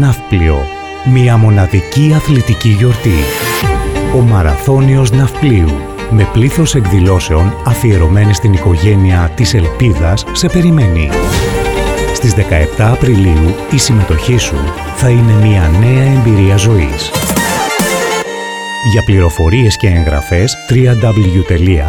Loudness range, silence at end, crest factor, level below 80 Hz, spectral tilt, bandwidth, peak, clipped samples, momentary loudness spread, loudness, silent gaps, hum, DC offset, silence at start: 2 LU; 0 s; 8 dB; -20 dBFS; -6 dB/octave; 19 kHz; 0 dBFS; under 0.1%; 5 LU; -10 LUFS; none; none; 0.6%; 0 s